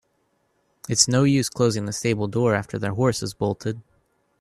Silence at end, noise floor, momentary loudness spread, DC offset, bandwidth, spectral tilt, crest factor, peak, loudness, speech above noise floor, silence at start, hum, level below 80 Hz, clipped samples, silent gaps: 0.6 s; -69 dBFS; 12 LU; under 0.1%; 13.5 kHz; -4.5 dB/octave; 22 dB; -2 dBFS; -22 LUFS; 47 dB; 0.9 s; none; -56 dBFS; under 0.1%; none